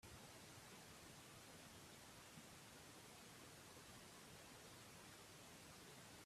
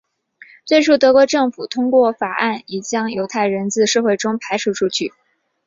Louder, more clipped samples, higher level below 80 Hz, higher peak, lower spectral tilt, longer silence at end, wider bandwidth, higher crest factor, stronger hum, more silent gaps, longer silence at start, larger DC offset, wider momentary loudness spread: second, -60 LUFS vs -17 LUFS; neither; second, -80 dBFS vs -62 dBFS; second, -48 dBFS vs -2 dBFS; about the same, -3 dB/octave vs -3.5 dB/octave; second, 0 s vs 0.6 s; first, 15.5 kHz vs 7.8 kHz; about the same, 14 dB vs 16 dB; neither; neither; second, 0 s vs 0.65 s; neither; second, 1 LU vs 10 LU